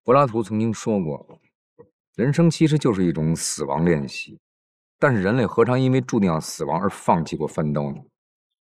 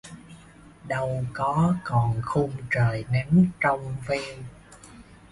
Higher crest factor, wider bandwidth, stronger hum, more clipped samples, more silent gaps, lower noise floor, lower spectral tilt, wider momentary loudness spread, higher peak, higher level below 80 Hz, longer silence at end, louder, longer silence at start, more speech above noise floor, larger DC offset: about the same, 18 dB vs 16 dB; first, 14 kHz vs 11.5 kHz; neither; neither; first, 1.55-1.76 s, 1.93-2.13 s, 4.39-4.99 s vs none; first, under -90 dBFS vs -49 dBFS; about the same, -6.5 dB/octave vs -7.5 dB/octave; second, 12 LU vs 16 LU; first, -4 dBFS vs -8 dBFS; about the same, -52 dBFS vs -50 dBFS; first, 0.65 s vs 0.15 s; first, -21 LUFS vs -25 LUFS; about the same, 0.05 s vs 0.05 s; first, over 69 dB vs 25 dB; neither